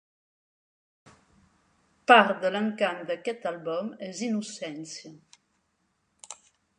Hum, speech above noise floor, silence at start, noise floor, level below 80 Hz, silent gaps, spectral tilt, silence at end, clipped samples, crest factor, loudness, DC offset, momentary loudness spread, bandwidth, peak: none; 48 dB; 2.1 s; -74 dBFS; -80 dBFS; none; -4 dB/octave; 0.45 s; under 0.1%; 26 dB; -26 LUFS; under 0.1%; 25 LU; 11 kHz; -2 dBFS